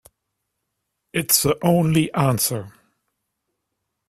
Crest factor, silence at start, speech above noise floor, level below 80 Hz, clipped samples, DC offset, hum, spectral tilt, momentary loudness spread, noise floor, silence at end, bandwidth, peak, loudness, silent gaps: 20 dB; 1.15 s; 59 dB; -54 dBFS; under 0.1%; under 0.1%; none; -4.5 dB/octave; 10 LU; -78 dBFS; 1.4 s; 16 kHz; -2 dBFS; -19 LUFS; none